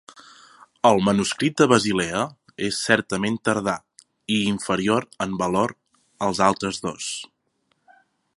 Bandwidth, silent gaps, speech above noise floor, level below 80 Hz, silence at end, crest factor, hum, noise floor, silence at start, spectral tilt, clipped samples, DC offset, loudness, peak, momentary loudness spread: 11.5 kHz; none; 48 dB; -56 dBFS; 1.1 s; 22 dB; none; -70 dBFS; 0.15 s; -4.5 dB/octave; under 0.1%; under 0.1%; -22 LUFS; 0 dBFS; 12 LU